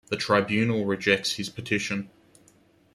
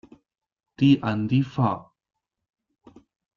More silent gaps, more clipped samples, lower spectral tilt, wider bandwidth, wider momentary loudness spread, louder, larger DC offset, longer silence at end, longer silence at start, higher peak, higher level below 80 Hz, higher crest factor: neither; neither; second, -4.5 dB/octave vs -8.5 dB/octave; first, 13.5 kHz vs 7 kHz; first, 9 LU vs 6 LU; about the same, -25 LUFS vs -23 LUFS; neither; second, 0.85 s vs 1.55 s; second, 0.1 s vs 0.8 s; about the same, -8 dBFS vs -8 dBFS; about the same, -64 dBFS vs -62 dBFS; about the same, 20 dB vs 18 dB